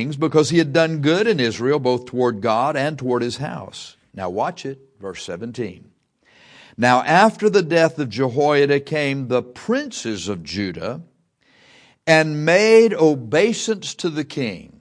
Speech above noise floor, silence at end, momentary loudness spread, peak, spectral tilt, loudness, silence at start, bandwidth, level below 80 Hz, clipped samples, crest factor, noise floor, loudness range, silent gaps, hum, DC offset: 40 dB; 0.2 s; 16 LU; 0 dBFS; -5 dB/octave; -19 LUFS; 0 s; 10.5 kHz; -60 dBFS; under 0.1%; 20 dB; -59 dBFS; 9 LU; none; none; under 0.1%